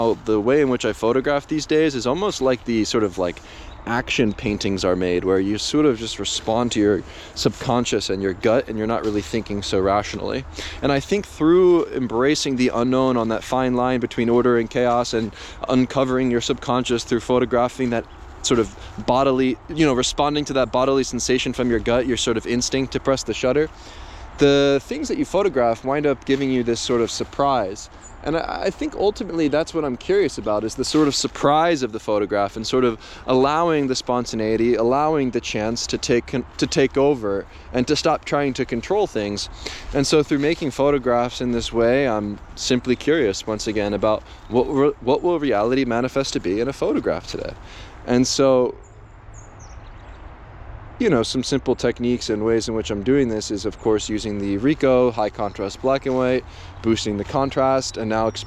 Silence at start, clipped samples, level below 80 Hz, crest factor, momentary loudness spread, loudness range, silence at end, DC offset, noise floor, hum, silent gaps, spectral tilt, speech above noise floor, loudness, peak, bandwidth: 0 s; under 0.1%; -42 dBFS; 16 dB; 8 LU; 3 LU; 0 s; under 0.1%; -42 dBFS; none; none; -5 dB/octave; 22 dB; -21 LUFS; -4 dBFS; 13 kHz